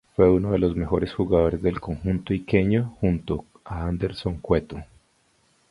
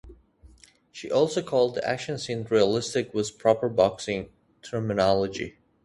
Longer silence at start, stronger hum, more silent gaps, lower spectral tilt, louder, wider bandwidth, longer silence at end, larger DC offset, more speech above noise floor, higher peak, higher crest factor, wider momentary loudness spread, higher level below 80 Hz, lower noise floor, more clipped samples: first, 0.2 s vs 0.05 s; neither; neither; first, -9 dB/octave vs -5 dB/octave; about the same, -24 LUFS vs -26 LUFS; about the same, 11 kHz vs 11.5 kHz; first, 0.85 s vs 0.35 s; neither; first, 41 dB vs 30 dB; about the same, -4 dBFS vs -6 dBFS; about the same, 20 dB vs 20 dB; about the same, 11 LU vs 12 LU; first, -38 dBFS vs -56 dBFS; first, -64 dBFS vs -55 dBFS; neither